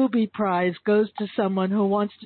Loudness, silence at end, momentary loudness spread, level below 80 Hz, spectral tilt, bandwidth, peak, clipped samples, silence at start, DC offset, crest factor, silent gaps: -23 LUFS; 0 s; 3 LU; -68 dBFS; -11.5 dB/octave; 4.5 kHz; -12 dBFS; under 0.1%; 0 s; under 0.1%; 12 dB; none